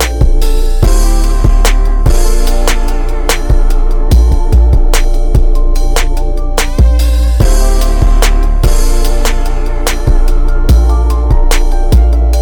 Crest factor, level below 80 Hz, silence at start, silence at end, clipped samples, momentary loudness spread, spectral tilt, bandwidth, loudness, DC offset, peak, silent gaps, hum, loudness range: 6 dB; -6 dBFS; 0 s; 0 s; 1%; 5 LU; -5 dB/octave; 17.5 kHz; -12 LUFS; under 0.1%; 0 dBFS; none; none; 1 LU